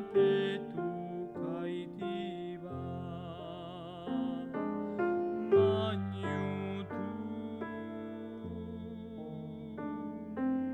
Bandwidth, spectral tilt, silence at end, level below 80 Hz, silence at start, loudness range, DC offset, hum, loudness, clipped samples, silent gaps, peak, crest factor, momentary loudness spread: 8.2 kHz; -8.5 dB/octave; 0 s; -66 dBFS; 0 s; 8 LU; under 0.1%; none; -36 LUFS; under 0.1%; none; -16 dBFS; 20 dB; 14 LU